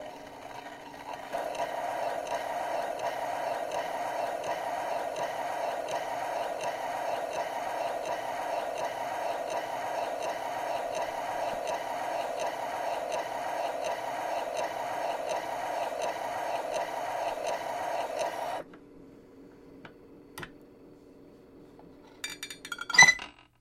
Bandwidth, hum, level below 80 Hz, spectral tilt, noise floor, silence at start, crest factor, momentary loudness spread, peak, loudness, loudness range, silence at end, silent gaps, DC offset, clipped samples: 16 kHz; none; -68 dBFS; -1.5 dB/octave; -54 dBFS; 0 s; 30 dB; 9 LU; -4 dBFS; -31 LUFS; 6 LU; 0.2 s; none; under 0.1%; under 0.1%